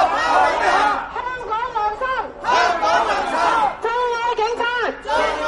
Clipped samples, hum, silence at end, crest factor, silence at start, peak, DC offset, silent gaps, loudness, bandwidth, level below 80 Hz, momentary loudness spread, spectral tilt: under 0.1%; none; 0 s; 16 dB; 0 s; -4 dBFS; under 0.1%; none; -19 LUFS; 11.5 kHz; -46 dBFS; 7 LU; -2.5 dB/octave